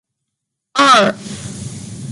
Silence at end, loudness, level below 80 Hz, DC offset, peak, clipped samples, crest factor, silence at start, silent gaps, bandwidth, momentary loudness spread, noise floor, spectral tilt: 0 s; -12 LUFS; -50 dBFS; under 0.1%; 0 dBFS; under 0.1%; 16 dB; 0.75 s; none; 11.5 kHz; 19 LU; -78 dBFS; -3.5 dB/octave